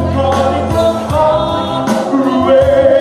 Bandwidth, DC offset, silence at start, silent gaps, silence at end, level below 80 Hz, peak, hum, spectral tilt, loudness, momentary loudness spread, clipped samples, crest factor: 14 kHz; under 0.1%; 0 s; none; 0 s; -32 dBFS; 0 dBFS; none; -6.5 dB/octave; -12 LUFS; 6 LU; under 0.1%; 10 dB